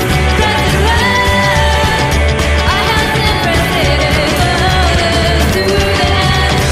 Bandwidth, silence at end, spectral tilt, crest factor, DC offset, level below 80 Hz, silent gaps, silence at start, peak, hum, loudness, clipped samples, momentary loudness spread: 15.5 kHz; 0 s; -4.5 dB/octave; 10 dB; under 0.1%; -18 dBFS; none; 0 s; 0 dBFS; none; -11 LUFS; under 0.1%; 2 LU